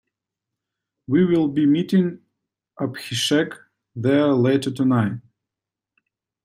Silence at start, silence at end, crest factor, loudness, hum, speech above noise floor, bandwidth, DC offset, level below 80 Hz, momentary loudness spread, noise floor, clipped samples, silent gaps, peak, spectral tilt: 1.1 s; 1.25 s; 16 dB; -20 LUFS; none; 68 dB; 15.5 kHz; under 0.1%; -64 dBFS; 11 LU; -87 dBFS; under 0.1%; none; -6 dBFS; -6 dB/octave